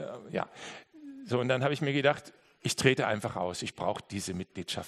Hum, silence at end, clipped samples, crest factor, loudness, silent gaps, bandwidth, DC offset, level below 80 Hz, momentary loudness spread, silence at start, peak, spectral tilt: none; 0 s; under 0.1%; 24 dB; -31 LUFS; none; 13 kHz; under 0.1%; -68 dBFS; 17 LU; 0 s; -8 dBFS; -4.5 dB/octave